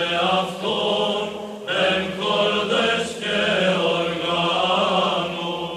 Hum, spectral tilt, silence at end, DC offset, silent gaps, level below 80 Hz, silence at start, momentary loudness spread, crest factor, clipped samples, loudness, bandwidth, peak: none; -4 dB/octave; 0 s; under 0.1%; none; -58 dBFS; 0 s; 6 LU; 14 dB; under 0.1%; -21 LUFS; 14.5 kHz; -6 dBFS